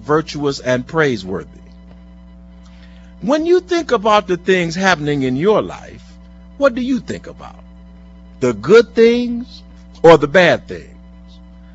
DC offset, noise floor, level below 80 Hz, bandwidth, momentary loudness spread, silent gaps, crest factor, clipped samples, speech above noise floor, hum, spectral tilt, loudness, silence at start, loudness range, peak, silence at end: under 0.1%; -39 dBFS; -42 dBFS; 8 kHz; 18 LU; none; 16 dB; under 0.1%; 25 dB; none; -5.5 dB/octave; -15 LUFS; 0 s; 7 LU; 0 dBFS; 0.9 s